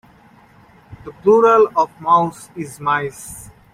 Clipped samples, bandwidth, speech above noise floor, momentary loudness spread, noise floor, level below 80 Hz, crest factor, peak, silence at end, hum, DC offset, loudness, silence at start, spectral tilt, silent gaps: under 0.1%; 15 kHz; 32 dB; 23 LU; -48 dBFS; -54 dBFS; 16 dB; -2 dBFS; 0.3 s; none; under 0.1%; -16 LUFS; 0.9 s; -5.5 dB/octave; none